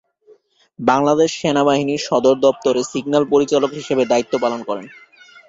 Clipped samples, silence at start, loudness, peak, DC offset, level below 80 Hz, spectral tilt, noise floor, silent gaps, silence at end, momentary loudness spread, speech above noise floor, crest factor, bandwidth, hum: under 0.1%; 0.8 s; -17 LUFS; -2 dBFS; under 0.1%; -58 dBFS; -5 dB/octave; -52 dBFS; none; 0.6 s; 6 LU; 35 dB; 16 dB; 7.8 kHz; none